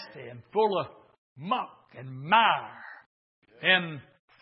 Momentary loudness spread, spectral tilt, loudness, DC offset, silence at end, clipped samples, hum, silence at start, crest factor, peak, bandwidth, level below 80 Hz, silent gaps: 23 LU; -8 dB/octave; -26 LUFS; under 0.1%; 0.4 s; under 0.1%; none; 0 s; 22 dB; -8 dBFS; 5.8 kHz; -78 dBFS; 1.18-1.36 s, 3.06-3.42 s